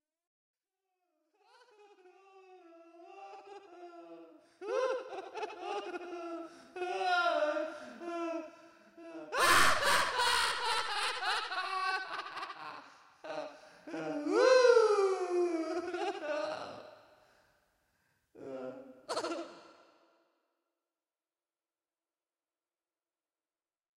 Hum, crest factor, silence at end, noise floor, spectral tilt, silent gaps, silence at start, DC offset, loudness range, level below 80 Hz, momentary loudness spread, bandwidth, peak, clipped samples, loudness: none; 22 dB; 4.35 s; under -90 dBFS; -2 dB/octave; none; 2.35 s; under 0.1%; 15 LU; -68 dBFS; 25 LU; 16 kHz; -14 dBFS; under 0.1%; -32 LUFS